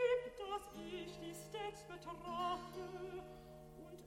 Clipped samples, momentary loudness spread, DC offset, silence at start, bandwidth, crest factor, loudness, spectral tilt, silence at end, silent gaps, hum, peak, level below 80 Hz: under 0.1%; 14 LU; under 0.1%; 0 s; 16.5 kHz; 18 dB; -46 LUFS; -4.5 dB/octave; 0 s; none; none; -26 dBFS; -66 dBFS